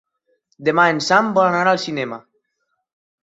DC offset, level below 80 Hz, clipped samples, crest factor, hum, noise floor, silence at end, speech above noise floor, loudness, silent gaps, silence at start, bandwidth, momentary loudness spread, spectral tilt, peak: under 0.1%; -66 dBFS; under 0.1%; 18 dB; none; -73 dBFS; 1.05 s; 56 dB; -17 LUFS; none; 0.6 s; 8.2 kHz; 12 LU; -4.5 dB/octave; -2 dBFS